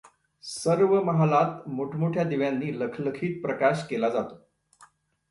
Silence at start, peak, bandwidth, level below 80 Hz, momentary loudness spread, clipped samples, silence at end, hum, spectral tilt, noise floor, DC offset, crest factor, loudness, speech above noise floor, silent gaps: 0.05 s; -8 dBFS; 11.5 kHz; -68 dBFS; 10 LU; under 0.1%; 0.45 s; none; -7 dB/octave; -59 dBFS; under 0.1%; 18 dB; -26 LUFS; 33 dB; none